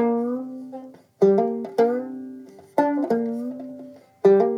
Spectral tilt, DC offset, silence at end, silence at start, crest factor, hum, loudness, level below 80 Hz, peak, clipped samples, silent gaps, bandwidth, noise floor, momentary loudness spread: -8.5 dB/octave; under 0.1%; 0 s; 0 s; 18 dB; none; -22 LUFS; -86 dBFS; -6 dBFS; under 0.1%; none; 6.8 kHz; -43 dBFS; 20 LU